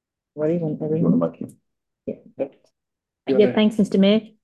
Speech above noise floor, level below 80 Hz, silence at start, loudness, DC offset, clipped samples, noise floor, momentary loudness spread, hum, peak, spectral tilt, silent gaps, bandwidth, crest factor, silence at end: 64 dB; -62 dBFS; 0.35 s; -21 LUFS; under 0.1%; under 0.1%; -84 dBFS; 19 LU; none; -6 dBFS; -8 dB/octave; none; 10 kHz; 16 dB; 0.15 s